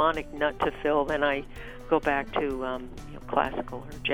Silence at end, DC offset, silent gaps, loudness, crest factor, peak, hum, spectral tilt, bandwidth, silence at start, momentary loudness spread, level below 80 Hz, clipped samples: 0 s; under 0.1%; none; -28 LUFS; 20 dB; -8 dBFS; none; -5.5 dB/octave; 16.5 kHz; 0 s; 15 LU; -44 dBFS; under 0.1%